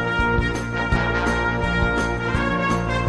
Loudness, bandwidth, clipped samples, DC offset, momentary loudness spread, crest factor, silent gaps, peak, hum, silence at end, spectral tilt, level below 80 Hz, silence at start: -21 LUFS; 11 kHz; under 0.1%; under 0.1%; 2 LU; 16 dB; none; -6 dBFS; none; 0 s; -6 dB/octave; -30 dBFS; 0 s